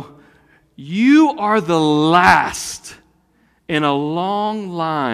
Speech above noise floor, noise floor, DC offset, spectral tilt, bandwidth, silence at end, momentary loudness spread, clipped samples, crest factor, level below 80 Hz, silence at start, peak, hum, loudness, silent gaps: 43 dB; -59 dBFS; under 0.1%; -5 dB/octave; 15 kHz; 0 s; 12 LU; under 0.1%; 16 dB; -54 dBFS; 0 s; 0 dBFS; none; -16 LUFS; none